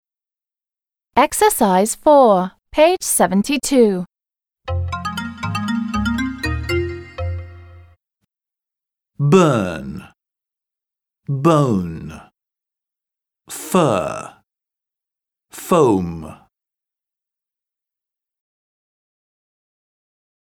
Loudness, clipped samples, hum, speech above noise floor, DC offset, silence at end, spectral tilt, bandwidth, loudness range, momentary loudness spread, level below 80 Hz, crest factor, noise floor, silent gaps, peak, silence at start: -17 LUFS; under 0.1%; none; over 75 dB; under 0.1%; 4.1 s; -5.5 dB/octave; over 20 kHz; 9 LU; 19 LU; -42 dBFS; 18 dB; under -90 dBFS; none; -2 dBFS; 1.15 s